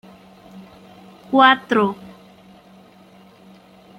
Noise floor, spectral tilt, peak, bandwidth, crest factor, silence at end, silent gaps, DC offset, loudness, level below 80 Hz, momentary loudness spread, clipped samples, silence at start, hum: -48 dBFS; -5.5 dB/octave; -2 dBFS; 12.5 kHz; 22 dB; 1.9 s; none; under 0.1%; -16 LUFS; -66 dBFS; 11 LU; under 0.1%; 0.55 s; none